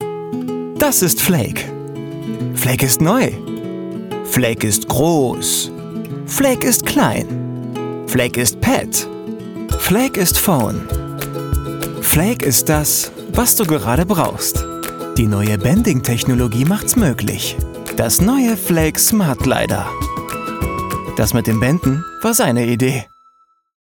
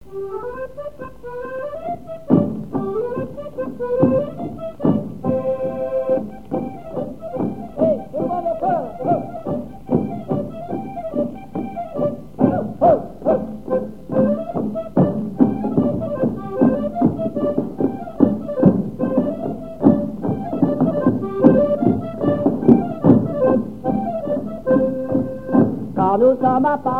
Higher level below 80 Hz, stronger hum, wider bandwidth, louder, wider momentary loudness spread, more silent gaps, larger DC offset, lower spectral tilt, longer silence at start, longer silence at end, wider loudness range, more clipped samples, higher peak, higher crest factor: first, -32 dBFS vs -46 dBFS; neither; first, 19 kHz vs 4.5 kHz; first, -16 LUFS vs -20 LUFS; about the same, 12 LU vs 13 LU; neither; second, under 0.1% vs 1%; second, -4.5 dB/octave vs -10.5 dB/octave; about the same, 0 s vs 0.05 s; first, 0.95 s vs 0 s; second, 3 LU vs 6 LU; neither; about the same, 0 dBFS vs 0 dBFS; about the same, 16 dB vs 20 dB